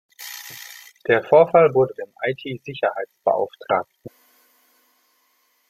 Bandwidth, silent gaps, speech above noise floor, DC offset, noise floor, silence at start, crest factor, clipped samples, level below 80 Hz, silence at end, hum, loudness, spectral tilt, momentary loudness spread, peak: 16.5 kHz; none; 45 dB; under 0.1%; -65 dBFS; 0.2 s; 20 dB; under 0.1%; -66 dBFS; 1.6 s; none; -20 LUFS; -5.5 dB/octave; 20 LU; -2 dBFS